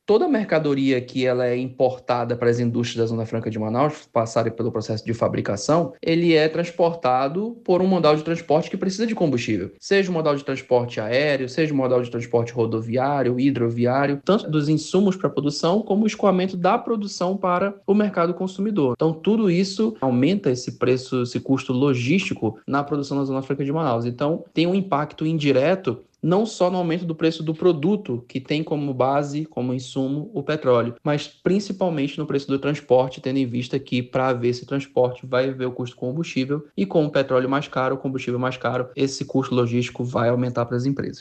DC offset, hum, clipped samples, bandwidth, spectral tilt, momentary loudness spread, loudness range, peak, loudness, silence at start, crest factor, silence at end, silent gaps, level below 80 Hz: under 0.1%; none; under 0.1%; 8.8 kHz; -6.5 dB/octave; 6 LU; 3 LU; -6 dBFS; -22 LUFS; 0.1 s; 16 dB; 0 s; none; -62 dBFS